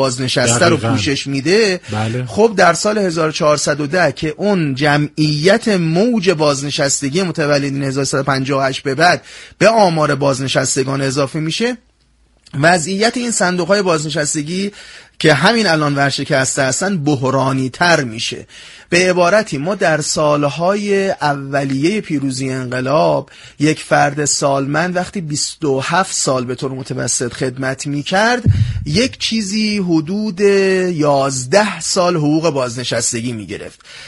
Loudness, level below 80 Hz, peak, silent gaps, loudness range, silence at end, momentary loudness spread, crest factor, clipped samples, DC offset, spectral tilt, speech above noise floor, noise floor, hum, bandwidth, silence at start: -15 LUFS; -44 dBFS; 0 dBFS; none; 2 LU; 0 s; 8 LU; 16 dB; under 0.1%; under 0.1%; -4 dB/octave; 39 dB; -55 dBFS; none; 11.5 kHz; 0 s